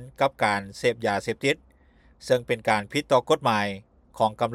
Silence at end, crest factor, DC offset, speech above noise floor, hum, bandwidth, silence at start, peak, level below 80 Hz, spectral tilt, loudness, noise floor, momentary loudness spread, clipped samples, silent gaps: 0 s; 18 dB; under 0.1%; 33 dB; none; 15 kHz; 0 s; -8 dBFS; -58 dBFS; -4.5 dB/octave; -25 LUFS; -57 dBFS; 6 LU; under 0.1%; none